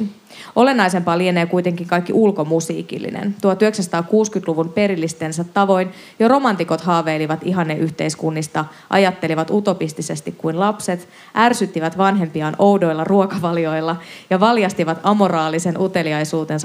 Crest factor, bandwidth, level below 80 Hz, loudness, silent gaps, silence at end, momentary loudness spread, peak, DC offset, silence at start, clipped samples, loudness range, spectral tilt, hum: 18 dB; 15.5 kHz; -70 dBFS; -18 LUFS; none; 0 s; 9 LU; 0 dBFS; under 0.1%; 0 s; under 0.1%; 2 LU; -5.5 dB/octave; none